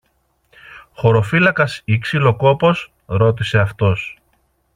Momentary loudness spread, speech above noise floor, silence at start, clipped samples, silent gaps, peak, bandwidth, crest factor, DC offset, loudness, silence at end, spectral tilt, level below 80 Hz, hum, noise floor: 9 LU; 48 dB; 0.7 s; under 0.1%; none; 0 dBFS; 10.5 kHz; 16 dB; under 0.1%; -16 LUFS; 0.65 s; -7 dB/octave; -48 dBFS; none; -63 dBFS